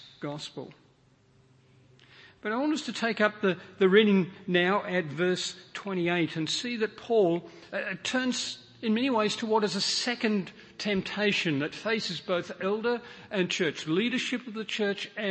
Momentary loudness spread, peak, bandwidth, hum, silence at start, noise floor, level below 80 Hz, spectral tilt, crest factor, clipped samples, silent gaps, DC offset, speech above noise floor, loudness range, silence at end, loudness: 10 LU; -8 dBFS; 8.8 kHz; none; 0 s; -63 dBFS; -72 dBFS; -4.5 dB/octave; 22 dB; under 0.1%; none; under 0.1%; 34 dB; 4 LU; 0 s; -28 LUFS